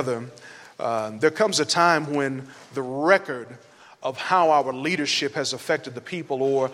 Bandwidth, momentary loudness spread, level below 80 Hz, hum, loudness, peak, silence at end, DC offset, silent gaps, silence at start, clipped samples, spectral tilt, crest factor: 15.5 kHz; 16 LU; -74 dBFS; none; -23 LUFS; -4 dBFS; 0 s; under 0.1%; none; 0 s; under 0.1%; -3.5 dB/octave; 20 dB